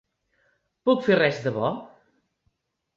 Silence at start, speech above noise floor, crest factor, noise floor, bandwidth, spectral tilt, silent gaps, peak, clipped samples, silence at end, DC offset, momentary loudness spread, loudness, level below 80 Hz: 0.85 s; 51 dB; 20 dB; -73 dBFS; 7.4 kHz; -6.5 dB/octave; none; -8 dBFS; under 0.1%; 1.1 s; under 0.1%; 9 LU; -23 LUFS; -66 dBFS